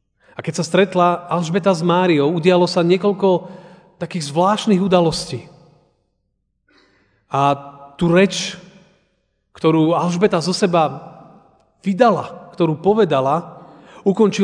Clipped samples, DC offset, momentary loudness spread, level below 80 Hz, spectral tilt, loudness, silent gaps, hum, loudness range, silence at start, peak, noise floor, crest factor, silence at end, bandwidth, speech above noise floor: under 0.1%; under 0.1%; 13 LU; -54 dBFS; -6 dB/octave; -17 LUFS; none; none; 5 LU; 0.4 s; 0 dBFS; -69 dBFS; 18 dB; 0 s; 10 kHz; 53 dB